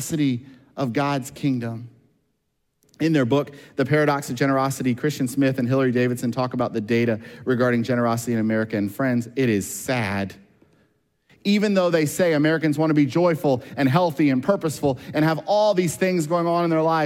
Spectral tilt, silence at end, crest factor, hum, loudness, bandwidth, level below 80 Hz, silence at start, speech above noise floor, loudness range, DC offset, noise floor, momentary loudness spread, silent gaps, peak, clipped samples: -6 dB/octave; 0 s; 16 dB; none; -22 LUFS; 16.5 kHz; -62 dBFS; 0 s; 52 dB; 5 LU; under 0.1%; -74 dBFS; 6 LU; none; -6 dBFS; under 0.1%